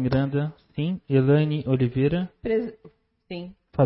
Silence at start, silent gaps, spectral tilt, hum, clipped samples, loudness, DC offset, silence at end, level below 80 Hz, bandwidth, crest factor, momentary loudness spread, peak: 0 s; none; -12.5 dB/octave; none; under 0.1%; -24 LUFS; under 0.1%; 0 s; -50 dBFS; 5.8 kHz; 16 dB; 17 LU; -8 dBFS